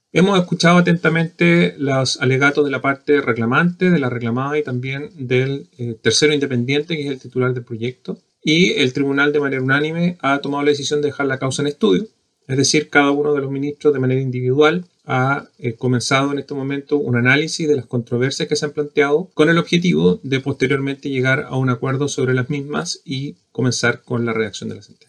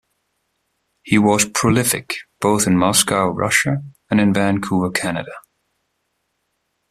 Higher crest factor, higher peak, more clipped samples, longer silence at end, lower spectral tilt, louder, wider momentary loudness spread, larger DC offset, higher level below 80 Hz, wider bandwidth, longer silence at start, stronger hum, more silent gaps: about the same, 18 dB vs 20 dB; about the same, 0 dBFS vs 0 dBFS; neither; second, 0.25 s vs 1.5 s; about the same, -5 dB/octave vs -4 dB/octave; about the same, -18 LUFS vs -17 LUFS; about the same, 10 LU vs 9 LU; neither; second, -62 dBFS vs -52 dBFS; second, 11 kHz vs 15.5 kHz; second, 0.15 s vs 1.05 s; neither; neither